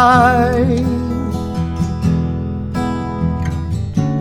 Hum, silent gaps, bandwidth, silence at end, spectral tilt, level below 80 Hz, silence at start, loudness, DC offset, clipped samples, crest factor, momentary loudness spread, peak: none; none; 13.5 kHz; 0 s; -7.5 dB/octave; -28 dBFS; 0 s; -17 LUFS; under 0.1%; under 0.1%; 16 dB; 9 LU; 0 dBFS